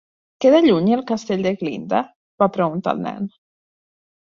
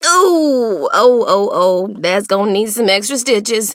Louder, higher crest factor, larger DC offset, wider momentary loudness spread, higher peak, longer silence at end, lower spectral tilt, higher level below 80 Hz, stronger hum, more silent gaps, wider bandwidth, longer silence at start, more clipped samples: second, -19 LUFS vs -13 LUFS; first, 18 dB vs 12 dB; neither; first, 13 LU vs 5 LU; about the same, -2 dBFS vs 0 dBFS; first, 0.95 s vs 0 s; first, -7 dB/octave vs -3 dB/octave; first, -62 dBFS vs -68 dBFS; neither; first, 2.16-2.38 s vs none; second, 7.4 kHz vs 16.5 kHz; first, 0.4 s vs 0 s; neither